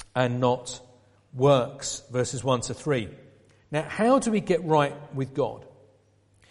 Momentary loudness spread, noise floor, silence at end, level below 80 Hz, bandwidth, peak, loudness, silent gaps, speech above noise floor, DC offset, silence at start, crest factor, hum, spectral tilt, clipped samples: 12 LU; -62 dBFS; 0.8 s; -58 dBFS; 11.5 kHz; -6 dBFS; -26 LUFS; none; 37 dB; under 0.1%; 0 s; 20 dB; none; -5.5 dB/octave; under 0.1%